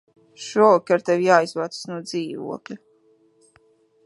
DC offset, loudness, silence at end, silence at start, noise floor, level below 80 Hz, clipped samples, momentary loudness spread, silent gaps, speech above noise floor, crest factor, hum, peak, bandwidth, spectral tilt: under 0.1%; -20 LUFS; 1.3 s; 0.4 s; -59 dBFS; -76 dBFS; under 0.1%; 19 LU; none; 39 dB; 22 dB; none; -2 dBFS; 11.5 kHz; -5 dB/octave